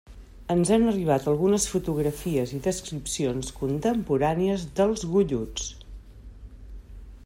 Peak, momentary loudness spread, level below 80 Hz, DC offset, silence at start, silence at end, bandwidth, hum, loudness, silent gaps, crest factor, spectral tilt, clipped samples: -10 dBFS; 12 LU; -44 dBFS; under 0.1%; 0.1 s; 0 s; 16 kHz; none; -25 LUFS; none; 18 dB; -5.5 dB/octave; under 0.1%